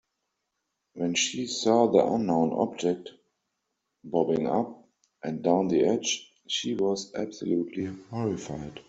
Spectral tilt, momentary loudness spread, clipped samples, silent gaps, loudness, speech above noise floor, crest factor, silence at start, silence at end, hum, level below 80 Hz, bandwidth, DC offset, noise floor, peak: -4.5 dB/octave; 12 LU; under 0.1%; none; -27 LUFS; 55 dB; 22 dB; 0.95 s; 0.05 s; none; -66 dBFS; 8.2 kHz; under 0.1%; -81 dBFS; -6 dBFS